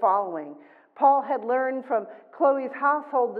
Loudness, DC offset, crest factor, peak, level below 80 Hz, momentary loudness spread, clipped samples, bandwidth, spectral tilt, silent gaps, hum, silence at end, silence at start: -24 LUFS; under 0.1%; 16 dB; -8 dBFS; under -90 dBFS; 13 LU; under 0.1%; 4.5 kHz; -8.5 dB/octave; none; none; 0 s; 0 s